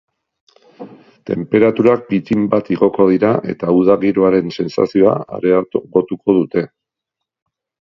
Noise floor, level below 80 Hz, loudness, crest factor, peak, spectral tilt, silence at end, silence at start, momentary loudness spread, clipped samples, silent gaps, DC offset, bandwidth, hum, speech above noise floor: -81 dBFS; -54 dBFS; -15 LUFS; 16 dB; 0 dBFS; -9 dB/octave; 1.25 s; 0.8 s; 8 LU; under 0.1%; none; under 0.1%; 7.2 kHz; none; 67 dB